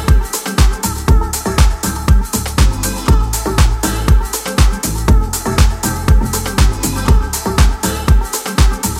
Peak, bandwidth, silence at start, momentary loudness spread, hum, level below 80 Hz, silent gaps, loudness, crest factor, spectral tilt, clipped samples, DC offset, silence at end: 0 dBFS; 16.5 kHz; 0 s; 3 LU; none; -14 dBFS; none; -15 LUFS; 12 dB; -4.5 dB/octave; under 0.1%; under 0.1%; 0 s